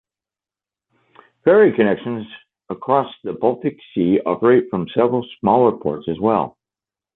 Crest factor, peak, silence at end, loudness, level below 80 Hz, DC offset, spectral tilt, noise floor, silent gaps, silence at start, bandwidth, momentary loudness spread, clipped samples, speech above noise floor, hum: 16 dB; -2 dBFS; 0.65 s; -18 LUFS; -56 dBFS; under 0.1%; -10.5 dB/octave; under -90 dBFS; none; 1.45 s; 4.1 kHz; 14 LU; under 0.1%; over 73 dB; none